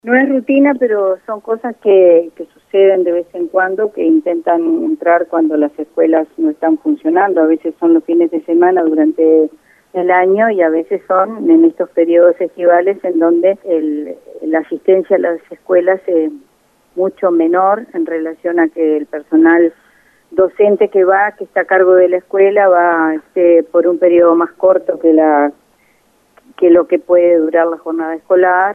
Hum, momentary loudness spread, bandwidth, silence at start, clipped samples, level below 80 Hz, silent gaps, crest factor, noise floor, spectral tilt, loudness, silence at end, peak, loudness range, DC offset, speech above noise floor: none; 9 LU; 3.4 kHz; 0.05 s; under 0.1%; -64 dBFS; none; 12 dB; -54 dBFS; -8 dB/octave; -12 LUFS; 0 s; 0 dBFS; 4 LU; under 0.1%; 43 dB